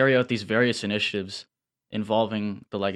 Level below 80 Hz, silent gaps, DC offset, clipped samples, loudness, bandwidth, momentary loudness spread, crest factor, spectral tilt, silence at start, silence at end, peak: -70 dBFS; none; under 0.1%; under 0.1%; -25 LUFS; 11.5 kHz; 12 LU; 18 dB; -5.5 dB/octave; 0 s; 0 s; -8 dBFS